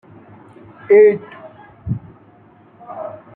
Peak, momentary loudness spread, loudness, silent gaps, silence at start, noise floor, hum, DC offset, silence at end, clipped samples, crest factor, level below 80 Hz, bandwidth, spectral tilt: -2 dBFS; 26 LU; -15 LUFS; none; 0.9 s; -48 dBFS; none; under 0.1%; 0.25 s; under 0.1%; 18 dB; -52 dBFS; 3.2 kHz; -11 dB/octave